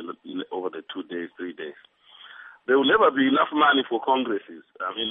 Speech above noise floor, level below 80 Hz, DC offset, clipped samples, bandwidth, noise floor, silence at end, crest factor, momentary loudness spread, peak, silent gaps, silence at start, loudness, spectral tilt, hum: 31 dB; -68 dBFS; under 0.1%; under 0.1%; 3.9 kHz; -53 dBFS; 0 s; 18 dB; 18 LU; -6 dBFS; none; 0 s; -23 LUFS; -7.5 dB/octave; none